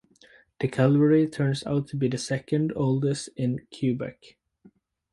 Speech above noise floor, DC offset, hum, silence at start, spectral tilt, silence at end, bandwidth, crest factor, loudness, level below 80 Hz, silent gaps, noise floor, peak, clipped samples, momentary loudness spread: 34 dB; under 0.1%; none; 0.6 s; -7 dB/octave; 1 s; 11.5 kHz; 18 dB; -25 LUFS; -62 dBFS; none; -59 dBFS; -8 dBFS; under 0.1%; 9 LU